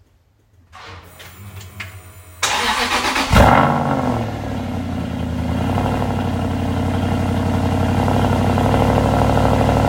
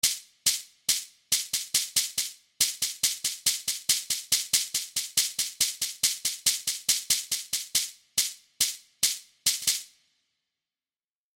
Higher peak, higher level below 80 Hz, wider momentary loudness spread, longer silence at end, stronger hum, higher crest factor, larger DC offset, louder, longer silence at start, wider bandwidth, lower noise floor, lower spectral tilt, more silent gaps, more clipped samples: first, 0 dBFS vs -6 dBFS; first, -30 dBFS vs -68 dBFS; first, 20 LU vs 4 LU; second, 0 s vs 1.5 s; neither; second, 18 dB vs 24 dB; neither; first, -18 LUFS vs -26 LUFS; first, 0.75 s vs 0.05 s; about the same, 16.5 kHz vs 16.5 kHz; second, -56 dBFS vs under -90 dBFS; first, -5.5 dB/octave vs 2.5 dB/octave; neither; neither